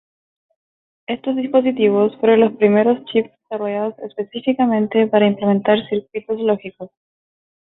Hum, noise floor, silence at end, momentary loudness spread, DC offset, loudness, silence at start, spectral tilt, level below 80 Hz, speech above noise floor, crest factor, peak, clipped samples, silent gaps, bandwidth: none; under -90 dBFS; 0.8 s; 14 LU; under 0.1%; -18 LUFS; 1.1 s; -11.5 dB/octave; -64 dBFS; over 73 dB; 16 dB; -2 dBFS; under 0.1%; none; 4.1 kHz